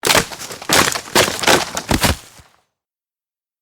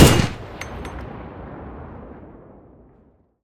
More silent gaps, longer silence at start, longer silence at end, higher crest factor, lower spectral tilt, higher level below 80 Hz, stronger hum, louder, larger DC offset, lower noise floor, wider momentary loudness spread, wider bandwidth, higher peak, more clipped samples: neither; about the same, 0.05 s vs 0 s; second, 1.4 s vs 1.6 s; about the same, 18 dB vs 22 dB; second, -2 dB/octave vs -5 dB/octave; about the same, -36 dBFS vs -34 dBFS; neither; first, -15 LUFS vs -24 LUFS; neither; first, under -90 dBFS vs -56 dBFS; second, 12 LU vs 22 LU; first, over 20 kHz vs 18 kHz; about the same, 0 dBFS vs 0 dBFS; neither